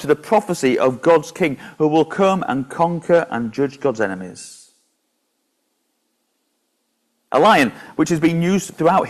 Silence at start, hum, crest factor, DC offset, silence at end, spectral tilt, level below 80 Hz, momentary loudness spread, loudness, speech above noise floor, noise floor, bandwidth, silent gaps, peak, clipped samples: 0 s; none; 16 dB; under 0.1%; 0 s; -5.5 dB/octave; -58 dBFS; 8 LU; -18 LUFS; 53 dB; -70 dBFS; 14 kHz; none; -2 dBFS; under 0.1%